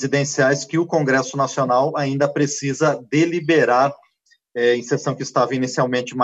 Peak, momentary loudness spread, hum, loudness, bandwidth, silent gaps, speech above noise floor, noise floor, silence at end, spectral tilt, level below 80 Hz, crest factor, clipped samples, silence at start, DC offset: -2 dBFS; 5 LU; none; -19 LUFS; 8.4 kHz; none; 42 dB; -61 dBFS; 0 s; -5 dB/octave; -68 dBFS; 16 dB; under 0.1%; 0 s; under 0.1%